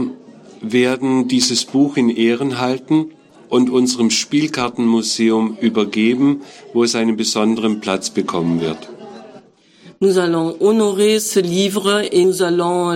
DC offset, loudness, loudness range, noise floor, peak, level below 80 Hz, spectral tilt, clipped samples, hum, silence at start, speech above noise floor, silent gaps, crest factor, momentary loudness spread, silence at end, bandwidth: under 0.1%; -16 LUFS; 3 LU; -46 dBFS; -4 dBFS; -60 dBFS; -4.5 dB/octave; under 0.1%; none; 0 s; 31 dB; none; 14 dB; 6 LU; 0 s; 16.5 kHz